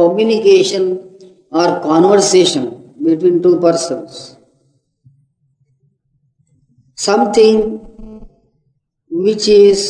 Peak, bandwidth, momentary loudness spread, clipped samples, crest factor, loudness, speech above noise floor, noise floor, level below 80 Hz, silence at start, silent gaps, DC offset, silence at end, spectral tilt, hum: 0 dBFS; 10.5 kHz; 15 LU; under 0.1%; 14 dB; -12 LUFS; 53 dB; -64 dBFS; -48 dBFS; 0 s; none; under 0.1%; 0 s; -4.5 dB/octave; none